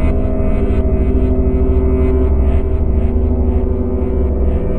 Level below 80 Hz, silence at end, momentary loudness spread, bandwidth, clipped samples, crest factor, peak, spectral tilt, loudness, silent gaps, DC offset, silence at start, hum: -14 dBFS; 0 s; 3 LU; 3.3 kHz; under 0.1%; 10 dB; -2 dBFS; -11.5 dB/octave; -16 LUFS; none; 6%; 0 s; none